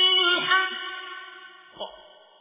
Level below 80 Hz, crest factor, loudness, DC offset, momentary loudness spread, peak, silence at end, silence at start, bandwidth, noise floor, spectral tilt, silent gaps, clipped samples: -74 dBFS; 20 dB; -21 LUFS; under 0.1%; 22 LU; -6 dBFS; 0.4 s; 0 s; 3.9 kHz; -50 dBFS; 3 dB/octave; none; under 0.1%